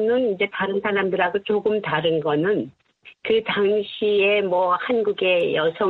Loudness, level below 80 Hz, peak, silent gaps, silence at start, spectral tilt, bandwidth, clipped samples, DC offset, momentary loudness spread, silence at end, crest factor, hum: -21 LUFS; -64 dBFS; -6 dBFS; none; 0 s; -7.5 dB/octave; 4.6 kHz; under 0.1%; under 0.1%; 4 LU; 0 s; 14 dB; none